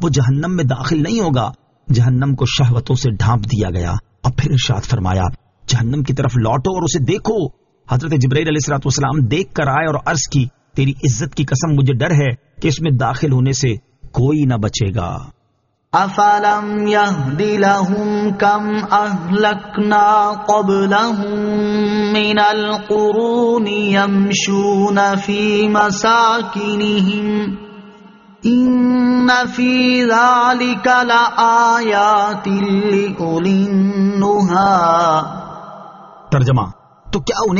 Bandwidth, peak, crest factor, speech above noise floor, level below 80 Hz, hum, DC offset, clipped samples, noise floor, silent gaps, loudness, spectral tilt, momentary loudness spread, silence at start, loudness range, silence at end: 7.4 kHz; 0 dBFS; 14 dB; 49 dB; -40 dBFS; none; under 0.1%; under 0.1%; -63 dBFS; none; -15 LUFS; -5 dB/octave; 7 LU; 0 s; 4 LU; 0 s